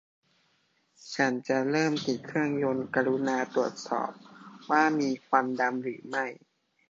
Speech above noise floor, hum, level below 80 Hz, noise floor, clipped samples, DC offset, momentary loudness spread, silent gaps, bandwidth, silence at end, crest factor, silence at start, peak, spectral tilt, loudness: 43 dB; none; -76 dBFS; -71 dBFS; under 0.1%; under 0.1%; 9 LU; none; 7.8 kHz; 0.55 s; 22 dB; 1.05 s; -8 dBFS; -5 dB/octave; -29 LUFS